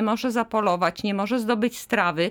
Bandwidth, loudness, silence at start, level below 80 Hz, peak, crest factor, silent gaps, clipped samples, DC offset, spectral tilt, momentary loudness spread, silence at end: over 20 kHz; -24 LUFS; 0 s; -60 dBFS; -8 dBFS; 16 dB; none; under 0.1%; under 0.1%; -5 dB/octave; 3 LU; 0 s